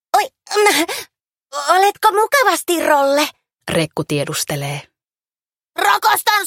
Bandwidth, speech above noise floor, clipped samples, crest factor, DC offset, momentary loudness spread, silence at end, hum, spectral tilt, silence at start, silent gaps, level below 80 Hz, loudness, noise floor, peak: 17 kHz; over 74 dB; under 0.1%; 16 dB; under 0.1%; 12 LU; 0 s; none; -3 dB/octave; 0.15 s; none; -58 dBFS; -16 LUFS; under -90 dBFS; 0 dBFS